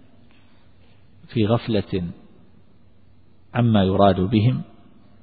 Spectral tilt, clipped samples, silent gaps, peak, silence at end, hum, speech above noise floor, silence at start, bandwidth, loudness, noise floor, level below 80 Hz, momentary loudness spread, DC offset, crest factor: -12.5 dB/octave; under 0.1%; none; -2 dBFS; 0.6 s; none; 37 dB; 1.3 s; 4.9 kHz; -21 LUFS; -55 dBFS; -50 dBFS; 12 LU; 0.4%; 22 dB